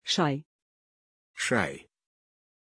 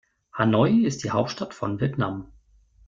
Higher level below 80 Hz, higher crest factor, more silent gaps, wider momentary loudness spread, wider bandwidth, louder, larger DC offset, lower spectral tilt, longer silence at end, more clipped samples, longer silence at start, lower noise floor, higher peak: second, -68 dBFS vs -56 dBFS; about the same, 24 dB vs 20 dB; first, 0.45-1.34 s vs none; first, 19 LU vs 11 LU; first, 10.5 kHz vs 7.6 kHz; second, -29 LUFS vs -24 LUFS; neither; second, -4 dB/octave vs -6.5 dB/octave; first, 0.95 s vs 0.6 s; neither; second, 0.05 s vs 0.35 s; first, under -90 dBFS vs -57 dBFS; second, -10 dBFS vs -4 dBFS